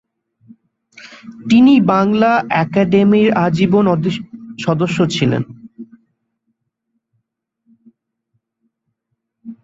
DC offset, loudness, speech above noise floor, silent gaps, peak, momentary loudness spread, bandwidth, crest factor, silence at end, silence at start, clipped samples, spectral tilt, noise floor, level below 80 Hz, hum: under 0.1%; -14 LUFS; 61 dB; none; -2 dBFS; 20 LU; 7.8 kHz; 16 dB; 0.1 s; 1.05 s; under 0.1%; -7 dB/octave; -74 dBFS; -54 dBFS; none